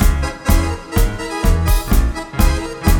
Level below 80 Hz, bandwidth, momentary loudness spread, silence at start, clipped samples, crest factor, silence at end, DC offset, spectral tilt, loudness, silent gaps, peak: -16 dBFS; over 20 kHz; 4 LU; 0 s; under 0.1%; 14 dB; 0 s; under 0.1%; -5.5 dB/octave; -18 LUFS; none; 0 dBFS